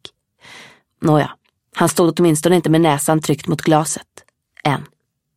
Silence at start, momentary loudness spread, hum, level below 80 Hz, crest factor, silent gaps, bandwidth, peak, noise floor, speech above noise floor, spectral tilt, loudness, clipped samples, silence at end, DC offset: 0.55 s; 10 LU; none; -56 dBFS; 18 dB; none; 16 kHz; 0 dBFS; -45 dBFS; 30 dB; -5.5 dB/octave; -17 LUFS; under 0.1%; 0.5 s; under 0.1%